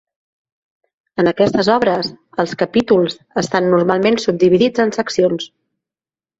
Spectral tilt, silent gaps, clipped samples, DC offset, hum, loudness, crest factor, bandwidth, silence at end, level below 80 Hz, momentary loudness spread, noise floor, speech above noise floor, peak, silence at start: -5.5 dB/octave; none; under 0.1%; under 0.1%; none; -16 LUFS; 16 dB; 8 kHz; 0.9 s; -54 dBFS; 9 LU; under -90 dBFS; over 75 dB; -2 dBFS; 1.15 s